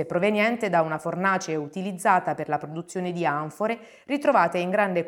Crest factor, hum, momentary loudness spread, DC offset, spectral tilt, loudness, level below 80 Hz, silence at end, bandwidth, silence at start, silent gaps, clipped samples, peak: 20 dB; none; 9 LU; under 0.1%; -5.5 dB/octave; -25 LUFS; -72 dBFS; 0 s; 17 kHz; 0 s; none; under 0.1%; -4 dBFS